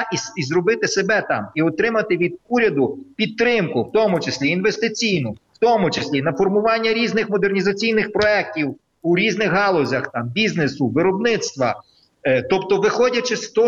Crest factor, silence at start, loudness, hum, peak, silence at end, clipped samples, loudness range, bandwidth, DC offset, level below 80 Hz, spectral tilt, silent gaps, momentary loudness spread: 16 dB; 0 s; -19 LUFS; none; -4 dBFS; 0 s; under 0.1%; 1 LU; 7.8 kHz; under 0.1%; -56 dBFS; -5 dB/octave; none; 6 LU